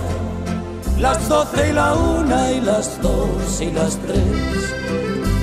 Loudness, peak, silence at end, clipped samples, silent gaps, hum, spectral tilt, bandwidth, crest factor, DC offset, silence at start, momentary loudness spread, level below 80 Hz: -19 LUFS; -4 dBFS; 0 s; under 0.1%; none; none; -5.5 dB/octave; 15.5 kHz; 14 dB; under 0.1%; 0 s; 8 LU; -26 dBFS